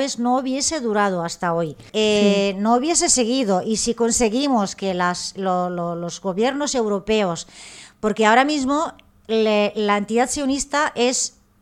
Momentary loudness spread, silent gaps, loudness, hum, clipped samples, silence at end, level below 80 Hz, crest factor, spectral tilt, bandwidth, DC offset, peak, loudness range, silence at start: 9 LU; none; -20 LUFS; none; under 0.1%; 0.3 s; -50 dBFS; 18 dB; -3.5 dB/octave; 15 kHz; under 0.1%; -2 dBFS; 3 LU; 0 s